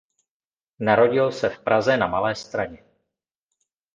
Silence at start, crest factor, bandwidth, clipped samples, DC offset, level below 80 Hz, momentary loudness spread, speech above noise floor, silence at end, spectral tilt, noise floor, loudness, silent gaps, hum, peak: 0.8 s; 20 dB; 7.8 kHz; under 0.1%; under 0.1%; -58 dBFS; 11 LU; over 69 dB; 1.2 s; -5.5 dB/octave; under -90 dBFS; -21 LUFS; none; none; -4 dBFS